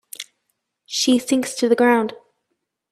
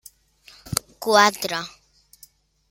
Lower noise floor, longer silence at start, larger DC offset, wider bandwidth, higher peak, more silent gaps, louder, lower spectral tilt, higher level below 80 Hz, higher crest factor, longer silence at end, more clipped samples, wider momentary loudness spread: first, -76 dBFS vs -54 dBFS; second, 0.2 s vs 0.65 s; neither; about the same, 15 kHz vs 16.5 kHz; second, -4 dBFS vs 0 dBFS; neither; about the same, -19 LUFS vs -21 LUFS; about the same, -2.5 dB/octave vs -2.5 dB/octave; second, -70 dBFS vs -56 dBFS; second, 18 dB vs 24 dB; second, 0.75 s vs 1 s; neither; first, 19 LU vs 13 LU